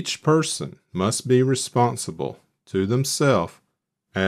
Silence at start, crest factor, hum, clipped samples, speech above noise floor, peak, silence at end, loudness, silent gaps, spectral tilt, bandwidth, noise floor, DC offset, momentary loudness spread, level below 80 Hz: 0 s; 16 dB; none; under 0.1%; 53 dB; -6 dBFS; 0 s; -22 LUFS; none; -5 dB/octave; 15 kHz; -75 dBFS; under 0.1%; 12 LU; -62 dBFS